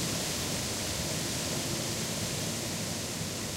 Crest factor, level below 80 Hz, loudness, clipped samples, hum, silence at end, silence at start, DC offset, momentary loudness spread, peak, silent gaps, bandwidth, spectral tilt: 14 dB; -52 dBFS; -32 LUFS; under 0.1%; none; 0 s; 0 s; under 0.1%; 2 LU; -20 dBFS; none; 16 kHz; -3 dB/octave